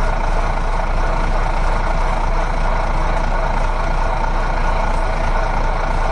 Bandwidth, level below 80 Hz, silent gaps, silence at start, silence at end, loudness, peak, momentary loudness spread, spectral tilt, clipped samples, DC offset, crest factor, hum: 9.6 kHz; -18 dBFS; none; 0 s; 0 s; -21 LUFS; -6 dBFS; 1 LU; -6 dB/octave; under 0.1%; under 0.1%; 10 dB; none